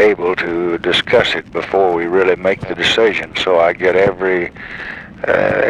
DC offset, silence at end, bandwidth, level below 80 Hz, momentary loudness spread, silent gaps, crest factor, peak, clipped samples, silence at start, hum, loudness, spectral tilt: under 0.1%; 0 s; 11 kHz; -44 dBFS; 10 LU; none; 14 dB; 0 dBFS; under 0.1%; 0 s; none; -15 LUFS; -4.5 dB/octave